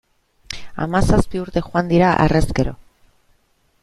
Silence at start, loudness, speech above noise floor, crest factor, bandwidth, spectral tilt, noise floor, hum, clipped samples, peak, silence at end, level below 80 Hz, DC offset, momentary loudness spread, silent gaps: 0.5 s; -18 LUFS; 44 dB; 18 dB; 12.5 kHz; -6.5 dB/octave; -61 dBFS; none; under 0.1%; 0 dBFS; 1.1 s; -30 dBFS; under 0.1%; 15 LU; none